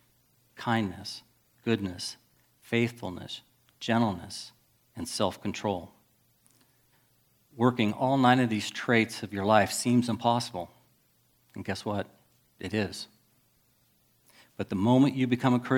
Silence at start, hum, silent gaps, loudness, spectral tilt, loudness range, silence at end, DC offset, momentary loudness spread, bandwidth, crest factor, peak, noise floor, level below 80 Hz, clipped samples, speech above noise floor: 0.55 s; none; none; -28 LUFS; -5.5 dB/octave; 11 LU; 0 s; under 0.1%; 18 LU; 17 kHz; 24 dB; -6 dBFS; -68 dBFS; -68 dBFS; under 0.1%; 40 dB